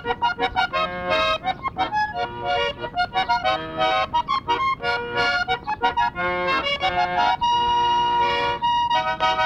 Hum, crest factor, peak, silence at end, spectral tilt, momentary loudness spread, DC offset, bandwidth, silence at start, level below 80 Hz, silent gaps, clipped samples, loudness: none; 16 dB; -8 dBFS; 0 s; -4 dB/octave; 5 LU; under 0.1%; 10 kHz; 0 s; -46 dBFS; none; under 0.1%; -22 LUFS